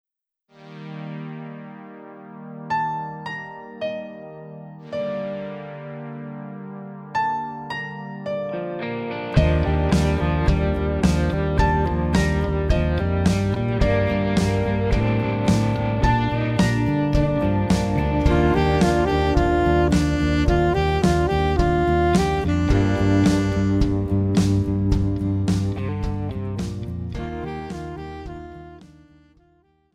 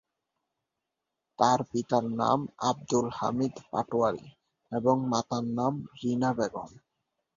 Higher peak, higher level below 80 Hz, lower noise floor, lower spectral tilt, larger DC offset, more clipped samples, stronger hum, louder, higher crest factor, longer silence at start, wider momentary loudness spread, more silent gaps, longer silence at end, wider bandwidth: first, -4 dBFS vs -8 dBFS; first, -30 dBFS vs -64 dBFS; second, -66 dBFS vs -86 dBFS; about the same, -7 dB/octave vs -6 dB/octave; neither; neither; neither; first, -21 LUFS vs -29 LUFS; second, 16 dB vs 22 dB; second, 0.6 s vs 1.4 s; first, 16 LU vs 8 LU; neither; first, 1.1 s vs 0.6 s; first, 13 kHz vs 7.6 kHz